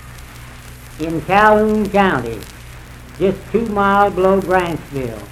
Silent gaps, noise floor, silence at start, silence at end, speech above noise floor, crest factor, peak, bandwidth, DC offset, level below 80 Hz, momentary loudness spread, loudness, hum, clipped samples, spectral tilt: none; -35 dBFS; 0 s; 0 s; 20 dB; 16 dB; 0 dBFS; 15.5 kHz; under 0.1%; -36 dBFS; 24 LU; -16 LUFS; none; under 0.1%; -6.5 dB/octave